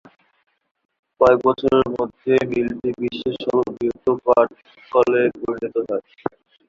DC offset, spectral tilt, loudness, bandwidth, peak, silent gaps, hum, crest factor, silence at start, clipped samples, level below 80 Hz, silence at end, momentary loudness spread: under 0.1%; -7 dB/octave; -20 LUFS; 7.2 kHz; -2 dBFS; none; none; 20 dB; 1.2 s; under 0.1%; -54 dBFS; 0.4 s; 10 LU